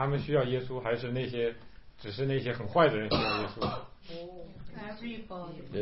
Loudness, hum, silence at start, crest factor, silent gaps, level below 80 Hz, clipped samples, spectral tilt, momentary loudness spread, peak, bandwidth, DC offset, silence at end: -31 LUFS; none; 0 s; 20 dB; none; -54 dBFS; under 0.1%; -10 dB/octave; 20 LU; -12 dBFS; 5.8 kHz; 0.3%; 0 s